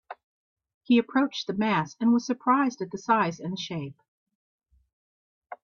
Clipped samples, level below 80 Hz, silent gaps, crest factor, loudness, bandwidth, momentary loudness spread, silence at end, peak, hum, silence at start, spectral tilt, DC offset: under 0.1%; -72 dBFS; 0.23-0.56 s, 0.74-0.81 s, 4.08-4.26 s, 4.35-4.59 s, 4.93-5.42 s; 20 dB; -26 LUFS; 7.2 kHz; 11 LU; 0.1 s; -8 dBFS; none; 0.1 s; -5.5 dB/octave; under 0.1%